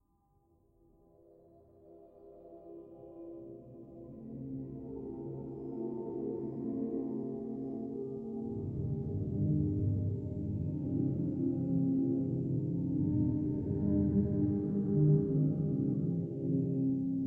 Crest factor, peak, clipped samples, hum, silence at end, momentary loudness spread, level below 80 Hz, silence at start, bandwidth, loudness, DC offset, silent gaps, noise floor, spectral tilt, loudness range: 16 dB; -18 dBFS; under 0.1%; none; 0 s; 18 LU; -56 dBFS; 1.85 s; 1.8 kHz; -34 LUFS; under 0.1%; none; -72 dBFS; -14 dB/octave; 17 LU